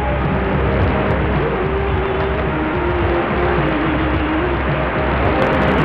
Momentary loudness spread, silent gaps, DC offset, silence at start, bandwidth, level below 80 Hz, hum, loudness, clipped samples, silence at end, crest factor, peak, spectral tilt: 3 LU; none; under 0.1%; 0 s; 5.6 kHz; -24 dBFS; none; -17 LUFS; under 0.1%; 0 s; 12 dB; -4 dBFS; -9 dB/octave